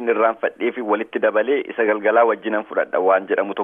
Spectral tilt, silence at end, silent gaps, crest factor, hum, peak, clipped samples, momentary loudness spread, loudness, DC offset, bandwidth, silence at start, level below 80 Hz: -7.5 dB/octave; 0 s; none; 14 dB; none; -4 dBFS; under 0.1%; 6 LU; -19 LUFS; under 0.1%; 3.7 kHz; 0 s; -72 dBFS